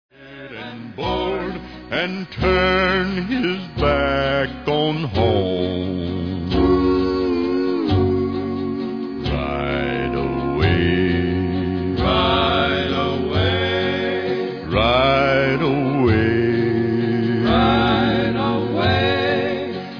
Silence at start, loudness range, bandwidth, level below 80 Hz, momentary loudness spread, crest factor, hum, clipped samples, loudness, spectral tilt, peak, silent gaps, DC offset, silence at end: 0.2 s; 3 LU; 5.4 kHz; -34 dBFS; 8 LU; 16 dB; none; under 0.1%; -19 LUFS; -8 dB/octave; -4 dBFS; none; 0.2%; 0 s